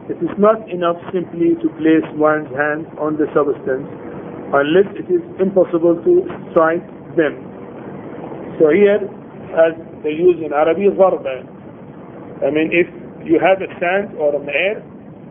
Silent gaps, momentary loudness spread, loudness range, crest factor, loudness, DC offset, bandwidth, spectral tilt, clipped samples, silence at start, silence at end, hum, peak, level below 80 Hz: none; 18 LU; 2 LU; 16 dB; -16 LUFS; under 0.1%; 3.6 kHz; -11 dB/octave; under 0.1%; 0 s; 0 s; none; 0 dBFS; -56 dBFS